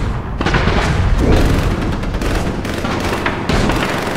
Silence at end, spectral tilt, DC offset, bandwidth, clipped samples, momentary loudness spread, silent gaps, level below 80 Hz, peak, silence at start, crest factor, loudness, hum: 0 s; -6 dB/octave; 2%; 16 kHz; under 0.1%; 6 LU; none; -20 dBFS; 0 dBFS; 0 s; 14 dB; -17 LUFS; none